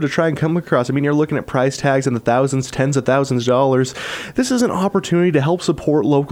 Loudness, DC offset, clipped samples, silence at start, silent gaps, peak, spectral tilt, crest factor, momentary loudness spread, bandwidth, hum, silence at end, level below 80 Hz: -17 LUFS; under 0.1%; under 0.1%; 0 s; none; -4 dBFS; -6 dB/octave; 14 dB; 4 LU; 15.5 kHz; none; 0 s; -50 dBFS